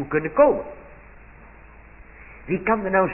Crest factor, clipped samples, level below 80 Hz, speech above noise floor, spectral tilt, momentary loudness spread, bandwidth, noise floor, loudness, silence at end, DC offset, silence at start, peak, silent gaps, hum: 18 dB; under 0.1%; -48 dBFS; 25 dB; -12 dB/octave; 23 LU; 3 kHz; -46 dBFS; -21 LUFS; 0 s; under 0.1%; 0 s; -4 dBFS; none; none